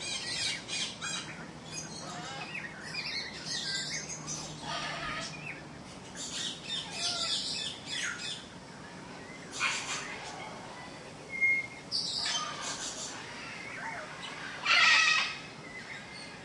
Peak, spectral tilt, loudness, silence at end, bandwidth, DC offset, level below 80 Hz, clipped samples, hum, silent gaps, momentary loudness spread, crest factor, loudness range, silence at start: -12 dBFS; -1 dB/octave; -32 LUFS; 0 s; 11.5 kHz; under 0.1%; -66 dBFS; under 0.1%; none; none; 17 LU; 24 dB; 8 LU; 0 s